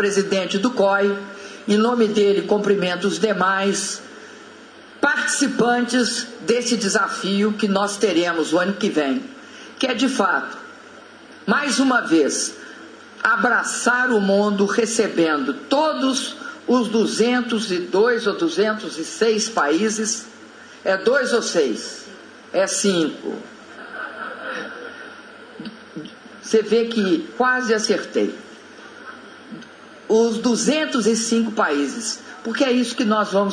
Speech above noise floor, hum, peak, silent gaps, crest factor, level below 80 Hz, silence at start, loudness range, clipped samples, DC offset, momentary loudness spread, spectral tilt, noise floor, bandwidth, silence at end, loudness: 23 dB; none; -4 dBFS; none; 18 dB; -70 dBFS; 0 s; 5 LU; under 0.1%; under 0.1%; 20 LU; -3.5 dB/octave; -43 dBFS; 10.5 kHz; 0 s; -20 LUFS